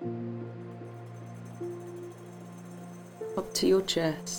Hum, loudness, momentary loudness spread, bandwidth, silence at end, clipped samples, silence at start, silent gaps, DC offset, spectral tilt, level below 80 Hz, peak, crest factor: none; -32 LUFS; 19 LU; 19 kHz; 0 s; under 0.1%; 0 s; none; under 0.1%; -4.5 dB/octave; -64 dBFS; -14 dBFS; 20 dB